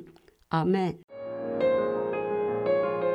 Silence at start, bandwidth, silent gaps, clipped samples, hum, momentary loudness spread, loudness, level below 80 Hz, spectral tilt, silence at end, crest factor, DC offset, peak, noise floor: 0 s; 7.2 kHz; 1.04-1.08 s; under 0.1%; none; 9 LU; -28 LUFS; -64 dBFS; -8.5 dB/octave; 0 s; 14 dB; under 0.1%; -14 dBFS; -53 dBFS